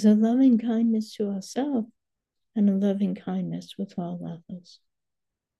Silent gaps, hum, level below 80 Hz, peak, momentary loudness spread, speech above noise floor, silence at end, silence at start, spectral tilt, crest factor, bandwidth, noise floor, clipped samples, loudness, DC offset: none; none; -76 dBFS; -10 dBFS; 18 LU; 62 dB; 1 s; 0 s; -7.5 dB/octave; 16 dB; 11.5 kHz; -86 dBFS; under 0.1%; -25 LUFS; under 0.1%